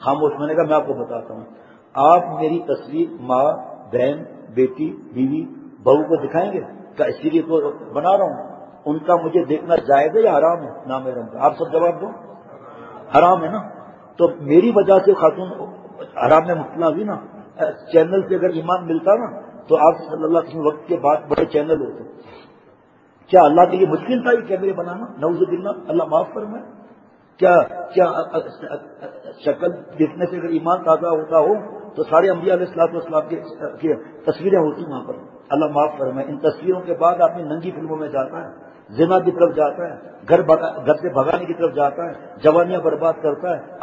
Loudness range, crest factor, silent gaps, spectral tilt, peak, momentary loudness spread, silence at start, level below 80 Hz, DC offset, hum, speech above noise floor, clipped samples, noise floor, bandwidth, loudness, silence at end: 4 LU; 18 dB; none; -8.5 dB/octave; 0 dBFS; 16 LU; 0 s; -60 dBFS; under 0.1%; none; 34 dB; under 0.1%; -52 dBFS; 7.8 kHz; -18 LUFS; 0 s